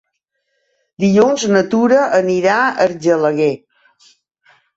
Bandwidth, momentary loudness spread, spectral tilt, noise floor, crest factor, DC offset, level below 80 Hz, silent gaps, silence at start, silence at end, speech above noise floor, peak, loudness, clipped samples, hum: 8 kHz; 6 LU; -5.5 dB/octave; -71 dBFS; 14 dB; under 0.1%; -60 dBFS; none; 1 s; 1.2 s; 58 dB; -2 dBFS; -14 LUFS; under 0.1%; none